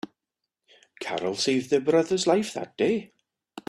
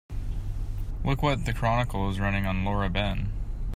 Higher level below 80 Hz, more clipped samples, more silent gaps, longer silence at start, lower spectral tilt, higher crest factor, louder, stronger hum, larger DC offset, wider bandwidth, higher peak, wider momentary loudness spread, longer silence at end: second, -70 dBFS vs -32 dBFS; neither; neither; about the same, 0.05 s vs 0.1 s; second, -4 dB/octave vs -6.5 dB/octave; about the same, 18 dB vs 16 dB; first, -25 LUFS vs -29 LUFS; neither; neither; second, 13 kHz vs 15.5 kHz; about the same, -8 dBFS vs -10 dBFS; about the same, 11 LU vs 10 LU; about the same, 0.1 s vs 0 s